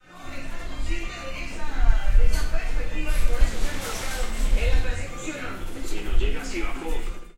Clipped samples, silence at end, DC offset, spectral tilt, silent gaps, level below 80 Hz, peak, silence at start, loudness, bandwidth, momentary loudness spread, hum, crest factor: under 0.1%; 0.05 s; under 0.1%; -4.5 dB/octave; none; -24 dBFS; -4 dBFS; 0.15 s; -30 LUFS; 13.5 kHz; 10 LU; none; 16 dB